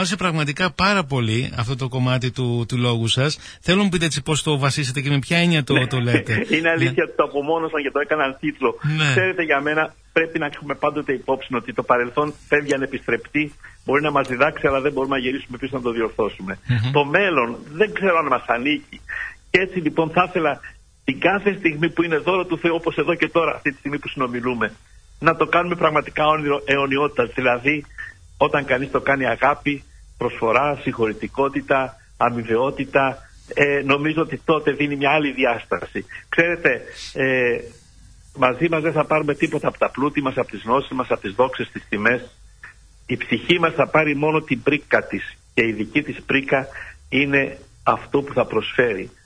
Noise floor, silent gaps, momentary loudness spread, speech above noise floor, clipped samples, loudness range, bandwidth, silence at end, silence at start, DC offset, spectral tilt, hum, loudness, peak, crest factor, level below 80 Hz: -47 dBFS; none; 8 LU; 27 dB; under 0.1%; 2 LU; 11 kHz; 0.15 s; 0 s; under 0.1%; -5.5 dB/octave; none; -20 LUFS; -2 dBFS; 20 dB; -48 dBFS